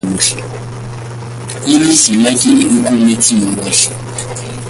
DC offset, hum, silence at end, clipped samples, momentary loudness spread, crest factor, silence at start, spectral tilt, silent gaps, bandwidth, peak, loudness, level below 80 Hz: under 0.1%; none; 0 s; under 0.1%; 17 LU; 12 dB; 0.05 s; -3 dB/octave; none; 11.5 kHz; 0 dBFS; -11 LUFS; -42 dBFS